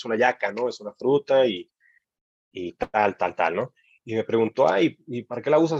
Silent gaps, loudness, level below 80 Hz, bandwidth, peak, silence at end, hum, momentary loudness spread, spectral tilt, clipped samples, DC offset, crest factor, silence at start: 2.21-2.51 s; -24 LUFS; -62 dBFS; 7.6 kHz; -6 dBFS; 0 s; none; 14 LU; -6 dB/octave; under 0.1%; under 0.1%; 18 dB; 0 s